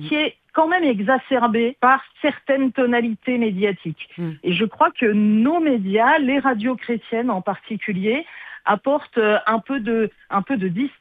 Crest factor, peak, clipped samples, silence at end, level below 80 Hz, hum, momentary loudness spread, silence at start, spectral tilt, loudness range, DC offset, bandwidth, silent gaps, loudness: 16 dB; -4 dBFS; under 0.1%; 0.1 s; -64 dBFS; none; 9 LU; 0 s; -8.5 dB/octave; 3 LU; under 0.1%; 4.7 kHz; none; -20 LUFS